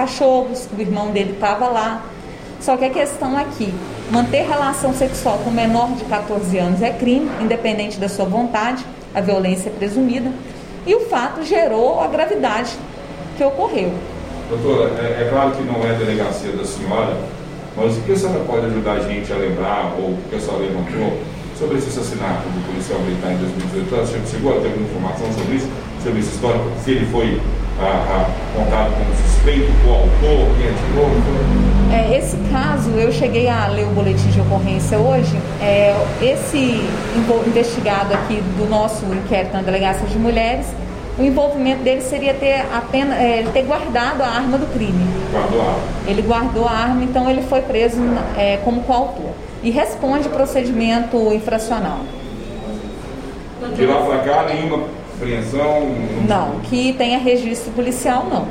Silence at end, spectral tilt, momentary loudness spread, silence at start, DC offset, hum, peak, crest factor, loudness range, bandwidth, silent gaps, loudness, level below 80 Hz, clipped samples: 0 s; -6 dB/octave; 8 LU; 0 s; under 0.1%; none; -2 dBFS; 14 dB; 4 LU; 15 kHz; none; -18 LUFS; -26 dBFS; under 0.1%